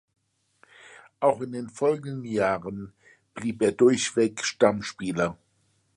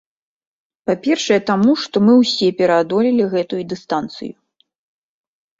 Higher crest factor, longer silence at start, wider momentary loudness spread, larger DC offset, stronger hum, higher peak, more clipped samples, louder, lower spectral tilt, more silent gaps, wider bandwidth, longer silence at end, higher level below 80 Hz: about the same, 20 dB vs 16 dB; about the same, 0.9 s vs 0.85 s; about the same, 13 LU vs 13 LU; neither; neither; second, -6 dBFS vs -2 dBFS; neither; second, -25 LUFS vs -16 LUFS; about the same, -4.5 dB/octave vs -5.5 dB/octave; neither; first, 11.5 kHz vs 7.8 kHz; second, 0.65 s vs 1.3 s; about the same, -62 dBFS vs -60 dBFS